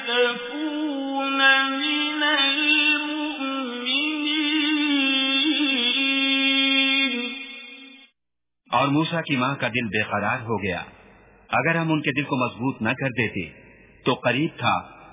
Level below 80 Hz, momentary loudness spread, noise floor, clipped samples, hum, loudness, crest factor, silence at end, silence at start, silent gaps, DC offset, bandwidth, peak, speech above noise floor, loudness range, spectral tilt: -60 dBFS; 10 LU; -87 dBFS; under 0.1%; none; -21 LUFS; 18 dB; 0 s; 0 s; none; under 0.1%; 3.9 kHz; -6 dBFS; 63 dB; 6 LU; -2 dB/octave